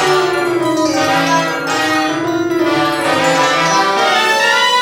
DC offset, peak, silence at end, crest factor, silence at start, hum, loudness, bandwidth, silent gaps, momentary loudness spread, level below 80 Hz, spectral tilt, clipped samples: under 0.1%; 0 dBFS; 0 s; 12 dB; 0 s; none; -13 LUFS; 18 kHz; none; 5 LU; -54 dBFS; -3 dB/octave; under 0.1%